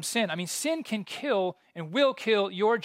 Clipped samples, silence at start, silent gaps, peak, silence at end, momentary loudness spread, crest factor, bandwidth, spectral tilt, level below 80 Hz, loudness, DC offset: under 0.1%; 0 s; none; -12 dBFS; 0 s; 8 LU; 16 dB; 16 kHz; -3.5 dB/octave; -86 dBFS; -28 LUFS; under 0.1%